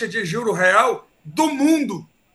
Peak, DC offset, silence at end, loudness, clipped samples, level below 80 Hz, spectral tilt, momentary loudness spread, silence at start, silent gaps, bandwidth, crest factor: -2 dBFS; under 0.1%; 0.3 s; -19 LUFS; under 0.1%; -66 dBFS; -4.5 dB/octave; 15 LU; 0 s; none; 12.5 kHz; 18 dB